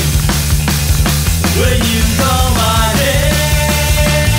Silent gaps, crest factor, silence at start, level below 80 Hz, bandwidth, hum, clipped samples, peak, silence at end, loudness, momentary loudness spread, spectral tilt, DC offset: none; 12 dB; 0 s; -16 dBFS; 16.5 kHz; none; under 0.1%; 0 dBFS; 0 s; -12 LUFS; 2 LU; -4 dB/octave; under 0.1%